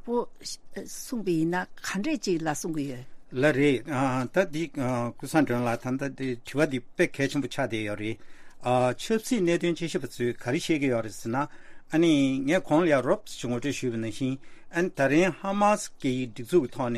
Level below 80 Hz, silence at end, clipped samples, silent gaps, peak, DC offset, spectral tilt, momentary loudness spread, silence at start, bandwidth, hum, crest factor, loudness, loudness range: -54 dBFS; 0 s; under 0.1%; none; -8 dBFS; under 0.1%; -5.5 dB/octave; 11 LU; 0.05 s; 15 kHz; none; 18 dB; -27 LUFS; 3 LU